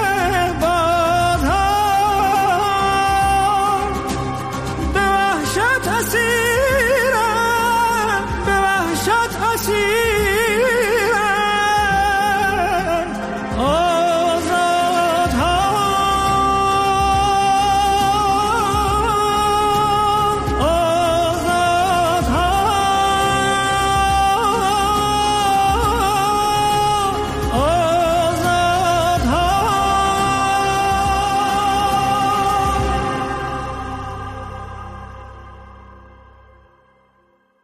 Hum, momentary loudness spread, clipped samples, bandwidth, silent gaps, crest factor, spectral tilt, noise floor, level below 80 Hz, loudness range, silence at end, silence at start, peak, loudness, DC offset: none; 5 LU; under 0.1%; 15.5 kHz; none; 10 dB; -4 dB/octave; -58 dBFS; -32 dBFS; 2 LU; 1.65 s; 0 s; -6 dBFS; -17 LUFS; under 0.1%